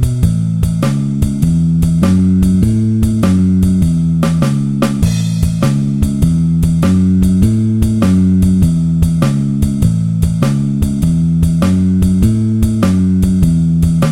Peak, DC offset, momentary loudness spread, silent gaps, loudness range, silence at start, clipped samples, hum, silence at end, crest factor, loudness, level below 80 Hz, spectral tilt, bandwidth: 0 dBFS; 0.5%; 4 LU; none; 1 LU; 0 s; under 0.1%; none; 0 s; 12 dB; -12 LUFS; -22 dBFS; -8 dB/octave; 15.5 kHz